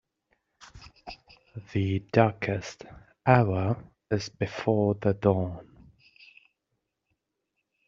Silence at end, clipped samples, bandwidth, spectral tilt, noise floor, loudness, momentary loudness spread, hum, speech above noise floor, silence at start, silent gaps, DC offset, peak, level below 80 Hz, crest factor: 2.25 s; under 0.1%; 7.4 kHz; -6.5 dB/octave; -81 dBFS; -27 LUFS; 23 LU; none; 55 dB; 0.6 s; none; under 0.1%; -4 dBFS; -60 dBFS; 26 dB